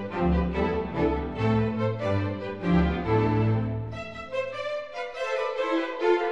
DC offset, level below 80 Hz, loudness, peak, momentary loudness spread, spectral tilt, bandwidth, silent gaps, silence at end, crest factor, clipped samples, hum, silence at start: 0.3%; -38 dBFS; -27 LUFS; -12 dBFS; 9 LU; -8 dB/octave; 7.8 kHz; none; 0 s; 14 dB; under 0.1%; none; 0 s